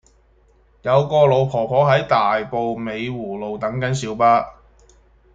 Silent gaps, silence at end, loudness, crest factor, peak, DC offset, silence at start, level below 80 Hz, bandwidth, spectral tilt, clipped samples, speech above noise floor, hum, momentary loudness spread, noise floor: none; 0.85 s; -19 LUFS; 18 dB; -2 dBFS; under 0.1%; 0.85 s; -52 dBFS; 9.2 kHz; -6.5 dB/octave; under 0.1%; 37 dB; none; 11 LU; -55 dBFS